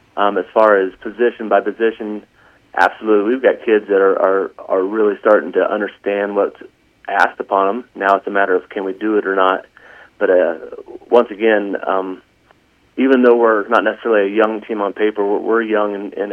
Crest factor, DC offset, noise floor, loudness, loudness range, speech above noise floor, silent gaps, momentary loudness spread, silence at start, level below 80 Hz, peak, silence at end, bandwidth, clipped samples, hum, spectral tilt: 16 dB; under 0.1%; -54 dBFS; -16 LUFS; 3 LU; 38 dB; none; 9 LU; 0.15 s; -64 dBFS; 0 dBFS; 0 s; 6.6 kHz; under 0.1%; none; -6.5 dB/octave